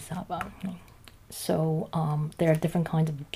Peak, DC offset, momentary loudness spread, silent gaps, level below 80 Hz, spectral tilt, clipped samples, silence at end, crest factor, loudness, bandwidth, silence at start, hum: -12 dBFS; under 0.1%; 13 LU; none; -56 dBFS; -7 dB/octave; under 0.1%; 0.1 s; 18 dB; -29 LUFS; 15.5 kHz; 0 s; none